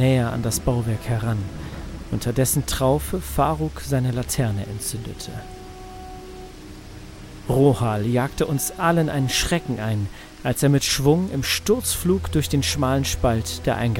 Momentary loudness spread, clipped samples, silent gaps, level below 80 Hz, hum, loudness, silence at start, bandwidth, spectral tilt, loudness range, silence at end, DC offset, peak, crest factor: 19 LU; under 0.1%; none; -36 dBFS; none; -22 LUFS; 0 s; 17 kHz; -5 dB/octave; 6 LU; 0 s; under 0.1%; -4 dBFS; 18 dB